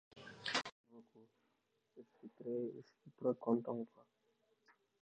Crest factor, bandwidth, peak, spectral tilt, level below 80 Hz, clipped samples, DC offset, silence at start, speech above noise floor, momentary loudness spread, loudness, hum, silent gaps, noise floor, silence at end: 22 dB; 9.4 kHz; -24 dBFS; -4.5 dB/octave; -90 dBFS; under 0.1%; under 0.1%; 0.15 s; 40 dB; 23 LU; -42 LUFS; none; 0.72-0.84 s; -83 dBFS; 1 s